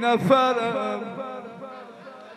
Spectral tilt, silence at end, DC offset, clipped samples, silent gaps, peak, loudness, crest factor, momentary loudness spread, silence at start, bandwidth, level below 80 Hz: -6 dB/octave; 0 s; under 0.1%; under 0.1%; none; -6 dBFS; -23 LUFS; 20 dB; 22 LU; 0 s; 14 kHz; -72 dBFS